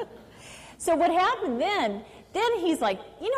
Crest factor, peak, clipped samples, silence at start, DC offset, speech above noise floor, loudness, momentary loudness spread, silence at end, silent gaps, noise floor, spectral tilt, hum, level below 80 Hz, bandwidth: 12 dB; -16 dBFS; under 0.1%; 0 s; under 0.1%; 22 dB; -26 LUFS; 22 LU; 0 s; none; -47 dBFS; -3.5 dB/octave; none; -60 dBFS; 15 kHz